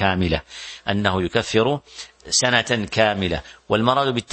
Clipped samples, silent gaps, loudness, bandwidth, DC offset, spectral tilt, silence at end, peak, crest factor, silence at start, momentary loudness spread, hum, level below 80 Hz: under 0.1%; none; -20 LUFS; 8.8 kHz; under 0.1%; -4 dB/octave; 0.1 s; 0 dBFS; 22 dB; 0 s; 11 LU; none; -42 dBFS